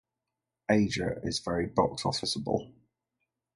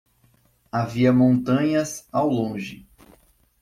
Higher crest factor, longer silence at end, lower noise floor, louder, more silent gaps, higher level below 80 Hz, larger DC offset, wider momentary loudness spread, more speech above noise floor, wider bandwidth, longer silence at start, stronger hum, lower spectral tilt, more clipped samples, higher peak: first, 22 dB vs 16 dB; about the same, 0.85 s vs 0.8 s; first, -88 dBFS vs -61 dBFS; second, -30 LUFS vs -22 LUFS; neither; about the same, -54 dBFS vs -56 dBFS; neither; second, 6 LU vs 12 LU; first, 58 dB vs 40 dB; second, 11.5 kHz vs 14.5 kHz; about the same, 0.7 s vs 0.75 s; neither; second, -5 dB/octave vs -7 dB/octave; neither; about the same, -10 dBFS vs -8 dBFS